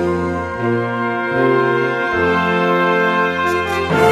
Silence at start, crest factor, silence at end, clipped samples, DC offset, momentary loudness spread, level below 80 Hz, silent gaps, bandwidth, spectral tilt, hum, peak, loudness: 0 s; 16 dB; 0 s; under 0.1%; under 0.1%; 5 LU; -46 dBFS; none; 14.5 kHz; -6 dB/octave; none; 0 dBFS; -16 LUFS